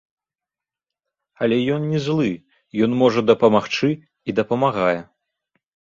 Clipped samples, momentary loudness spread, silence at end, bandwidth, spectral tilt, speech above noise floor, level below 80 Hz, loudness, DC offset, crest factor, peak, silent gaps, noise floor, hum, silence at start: under 0.1%; 10 LU; 0.95 s; 7.4 kHz; -7 dB/octave; 70 dB; -60 dBFS; -20 LUFS; under 0.1%; 20 dB; -2 dBFS; none; -89 dBFS; none; 1.4 s